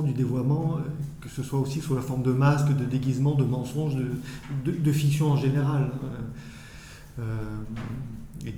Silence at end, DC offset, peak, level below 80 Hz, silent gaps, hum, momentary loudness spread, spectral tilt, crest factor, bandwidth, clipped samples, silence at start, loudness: 0 s; under 0.1%; -10 dBFS; -48 dBFS; none; none; 15 LU; -7.5 dB/octave; 16 dB; 14 kHz; under 0.1%; 0 s; -27 LUFS